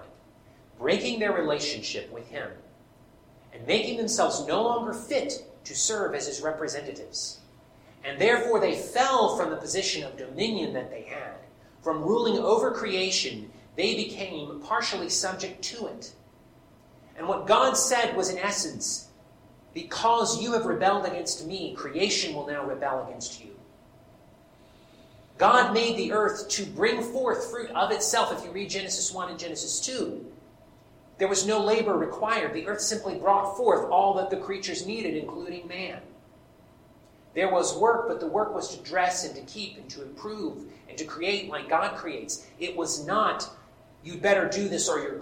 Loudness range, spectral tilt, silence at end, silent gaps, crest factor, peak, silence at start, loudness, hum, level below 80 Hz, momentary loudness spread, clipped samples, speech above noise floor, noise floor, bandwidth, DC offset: 6 LU; -2.5 dB/octave; 0 s; none; 22 dB; -8 dBFS; 0 s; -27 LUFS; none; -64 dBFS; 14 LU; under 0.1%; 28 dB; -55 dBFS; 16.5 kHz; under 0.1%